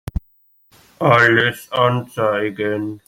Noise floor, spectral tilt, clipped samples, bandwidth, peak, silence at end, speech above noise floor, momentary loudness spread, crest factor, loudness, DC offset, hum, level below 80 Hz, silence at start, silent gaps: -57 dBFS; -6 dB/octave; under 0.1%; 16.5 kHz; 0 dBFS; 0.1 s; 40 dB; 10 LU; 18 dB; -17 LUFS; under 0.1%; none; -38 dBFS; 0.15 s; none